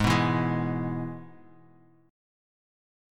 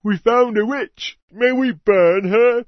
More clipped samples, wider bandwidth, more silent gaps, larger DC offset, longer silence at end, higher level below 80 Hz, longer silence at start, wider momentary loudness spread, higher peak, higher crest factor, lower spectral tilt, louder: neither; first, 15 kHz vs 6.4 kHz; second, none vs 1.22-1.28 s; neither; first, 1.8 s vs 0.05 s; first, -50 dBFS vs -56 dBFS; about the same, 0 s vs 0.05 s; about the same, 14 LU vs 12 LU; second, -8 dBFS vs -2 dBFS; first, 22 dB vs 14 dB; about the same, -6.5 dB/octave vs -6.5 dB/octave; second, -28 LUFS vs -17 LUFS